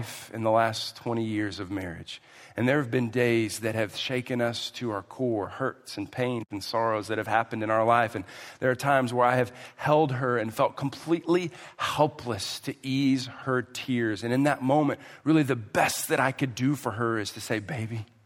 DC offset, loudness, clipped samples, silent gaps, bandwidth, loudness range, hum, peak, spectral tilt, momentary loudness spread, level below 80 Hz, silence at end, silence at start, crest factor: under 0.1%; -27 LUFS; under 0.1%; none; 16 kHz; 4 LU; none; -8 dBFS; -5.5 dB/octave; 10 LU; -68 dBFS; 0.2 s; 0 s; 20 dB